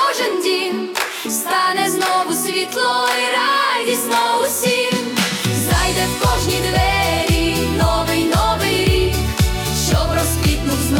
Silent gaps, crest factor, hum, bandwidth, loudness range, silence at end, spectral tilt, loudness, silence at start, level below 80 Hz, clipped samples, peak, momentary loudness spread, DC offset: none; 14 dB; none; 18 kHz; 1 LU; 0 s; -4 dB/octave; -17 LUFS; 0 s; -28 dBFS; under 0.1%; -2 dBFS; 3 LU; under 0.1%